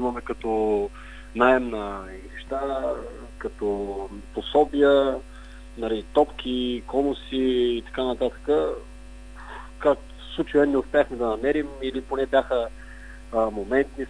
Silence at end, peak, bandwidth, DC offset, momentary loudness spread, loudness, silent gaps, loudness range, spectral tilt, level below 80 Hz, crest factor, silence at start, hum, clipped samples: 0 s; -4 dBFS; 10.5 kHz; under 0.1%; 19 LU; -25 LUFS; none; 3 LU; -6 dB/octave; -42 dBFS; 22 dB; 0 s; 50 Hz at -45 dBFS; under 0.1%